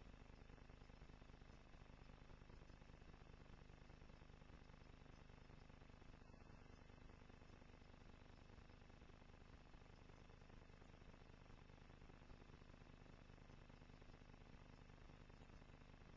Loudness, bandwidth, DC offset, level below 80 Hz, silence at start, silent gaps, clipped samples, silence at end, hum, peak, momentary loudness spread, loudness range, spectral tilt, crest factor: -66 LUFS; 7.2 kHz; under 0.1%; -68 dBFS; 0 s; none; under 0.1%; 0 s; none; -50 dBFS; 1 LU; 1 LU; -5 dB/octave; 14 dB